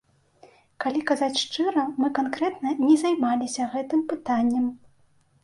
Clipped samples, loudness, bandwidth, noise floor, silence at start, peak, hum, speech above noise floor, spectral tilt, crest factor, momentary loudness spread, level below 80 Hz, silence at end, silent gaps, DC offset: under 0.1%; -25 LUFS; 11.5 kHz; -61 dBFS; 0.8 s; -8 dBFS; none; 37 dB; -3.5 dB/octave; 16 dB; 7 LU; -68 dBFS; 0.65 s; none; under 0.1%